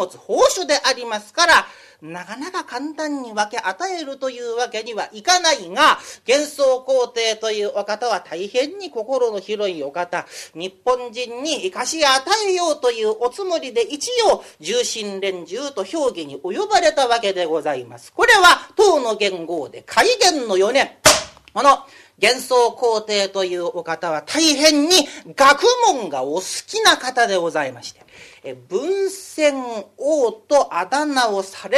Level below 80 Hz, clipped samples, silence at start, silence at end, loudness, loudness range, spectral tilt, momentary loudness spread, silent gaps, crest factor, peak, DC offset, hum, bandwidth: -56 dBFS; under 0.1%; 0 s; 0 s; -18 LUFS; 7 LU; -1.5 dB/octave; 14 LU; none; 18 dB; 0 dBFS; under 0.1%; none; 14 kHz